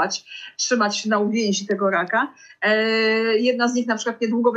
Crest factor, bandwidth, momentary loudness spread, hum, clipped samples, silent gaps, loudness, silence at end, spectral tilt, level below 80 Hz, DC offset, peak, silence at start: 14 dB; 8.4 kHz; 6 LU; none; under 0.1%; none; -21 LUFS; 0 s; -3.5 dB/octave; -74 dBFS; under 0.1%; -6 dBFS; 0 s